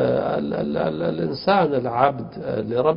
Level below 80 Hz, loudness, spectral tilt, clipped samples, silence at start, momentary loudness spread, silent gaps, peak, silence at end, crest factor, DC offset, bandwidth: -52 dBFS; -22 LUFS; -11.5 dB/octave; under 0.1%; 0 s; 7 LU; none; -2 dBFS; 0 s; 20 dB; under 0.1%; 5.4 kHz